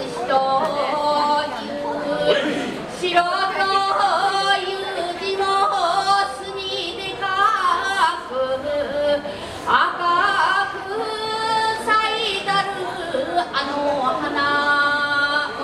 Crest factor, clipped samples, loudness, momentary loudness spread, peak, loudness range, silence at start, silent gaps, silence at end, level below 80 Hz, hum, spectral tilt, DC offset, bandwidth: 18 dB; under 0.1%; -20 LUFS; 8 LU; -2 dBFS; 2 LU; 0 s; none; 0 s; -54 dBFS; none; -3 dB/octave; under 0.1%; 13.5 kHz